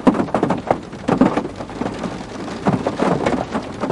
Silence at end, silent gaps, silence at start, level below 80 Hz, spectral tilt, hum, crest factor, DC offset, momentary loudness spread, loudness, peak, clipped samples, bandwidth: 0 s; none; 0 s; -44 dBFS; -7 dB/octave; none; 18 dB; under 0.1%; 11 LU; -21 LUFS; 0 dBFS; under 0.1%; 11.5 kHz